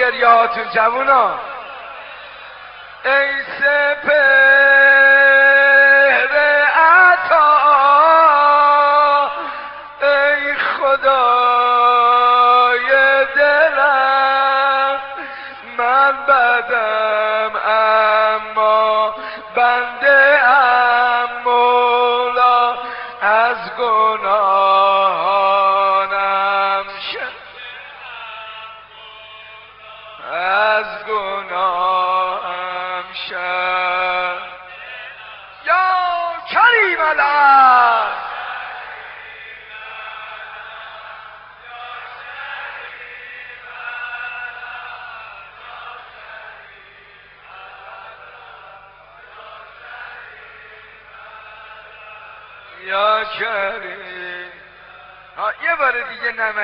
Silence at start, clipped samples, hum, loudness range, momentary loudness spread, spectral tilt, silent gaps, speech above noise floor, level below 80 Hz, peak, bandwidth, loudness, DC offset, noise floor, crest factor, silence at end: 0 s; under 0.1%; 50 Hz at -60 dBFS; 20 LU; 23 LU; -5.5 dB/octave; none; 30 dB; -60 dBFS; 0 dBFS; 5.6 kHz; -13 LUFS; under 0.1%; -44 dBFS; 16 dB; 0 s